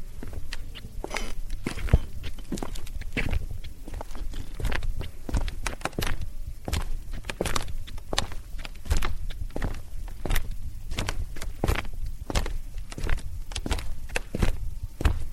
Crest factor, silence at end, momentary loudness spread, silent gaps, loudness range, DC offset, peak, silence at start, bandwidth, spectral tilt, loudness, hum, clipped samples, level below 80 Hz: 24 dB; 0 s; 11 LU; none; 2 LU; under 0.1%; -4 dBFS; 0 s; 15.5 kHz; -4.5 dB/octave; -33 LUFS; none; under 0.1%; -30 dBFS